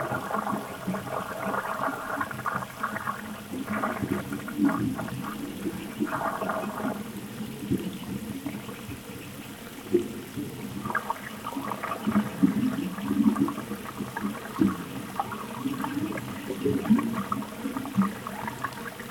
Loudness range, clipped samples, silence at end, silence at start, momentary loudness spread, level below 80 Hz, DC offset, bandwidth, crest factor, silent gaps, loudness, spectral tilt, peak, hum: 5 LU; under 0.1%; 0 s; 0 s; 11 LU; -60 dBFS; under 0.1%; 19 kHz; 22 dB; none; -31 LUFS; -6 dB/octave; -8 dBFS; none